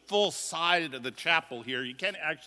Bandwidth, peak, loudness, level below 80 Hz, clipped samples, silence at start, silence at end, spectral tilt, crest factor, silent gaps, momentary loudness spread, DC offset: 11 kHz; -10 dBFS; -29 LUFS; -78 dBFS; under 0.1%; 0.1 s; 0 s; -2 dB/octave; 22 dB; none; 8 LU; under 0.1%